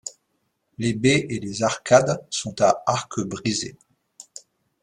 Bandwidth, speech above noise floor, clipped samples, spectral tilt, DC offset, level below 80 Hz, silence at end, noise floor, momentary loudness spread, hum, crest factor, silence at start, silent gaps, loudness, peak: 11.5 kHz; 51 dB; under 0.1%; -4.5 dB/octave; under 0.1%; -58 dBFS; 0.6 s; -73 dBFS; 21 LU; none; 22 dB; 0.05 s; none; -22 LUFS; -2 dBFS